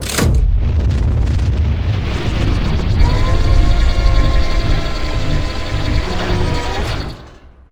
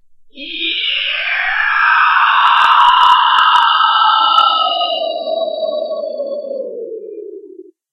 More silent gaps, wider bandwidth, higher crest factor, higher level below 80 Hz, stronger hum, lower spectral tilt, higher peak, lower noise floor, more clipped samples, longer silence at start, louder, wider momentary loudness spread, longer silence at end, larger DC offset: neither; first, 16 kHz vs 10.5 kHz; about the same, 14 dB vs 14 dB; first, -16 dBFS vs -54 dBFS; neither; first, -5.5 dB/octave vs -0.5 dB/octave; about the same, 0 dBFS vs 0 dBFS; about the same, -39 dBFS vs -38 dBFS; neither; second, 0 s vs 0.35 s; second, -17 LUFS vs -12 LUFS; second, 6 LU vs 17 LU; about the same, 0.4 s vs 0.3 s; neither